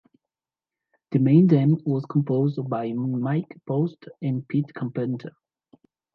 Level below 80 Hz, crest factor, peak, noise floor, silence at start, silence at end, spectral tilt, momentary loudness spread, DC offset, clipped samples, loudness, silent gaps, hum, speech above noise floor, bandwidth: -72 dBFS; 18 dB; -6 dBFS; under -90 dBFS; 1.1 s; 0.85 s; -11.5 dB/octave; 12 LU; under 0.1%; under 0.1%; -24 LUFS; none; none; over 67 dB; 4.9 kHz